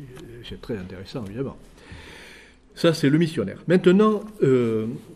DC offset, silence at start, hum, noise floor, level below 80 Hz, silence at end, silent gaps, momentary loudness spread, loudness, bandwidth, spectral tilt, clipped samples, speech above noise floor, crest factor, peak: under 0.1%; 0 s; none; -48 dBFS; -52 dBFS; 0 s; none; 23 LU; -22 LUFS; 13 kHz; -7 dB/octave; under 0.1%; 26 dB; 18 dB; -6 dBFS